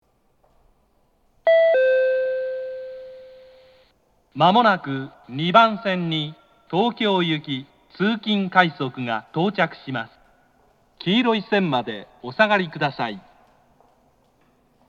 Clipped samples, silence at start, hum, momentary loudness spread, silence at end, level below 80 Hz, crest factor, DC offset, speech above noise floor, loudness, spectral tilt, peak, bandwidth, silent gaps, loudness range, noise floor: under 0.1%; 1.45 s; none; 17 LU; 1.7 s; -68 dBFS; 22 dB; under 0.1%; 42 dB; -21 LUFS; -7 dB/octave; 0 dBFS; 7.4 kHz; none; 3 LU; -63 dBFS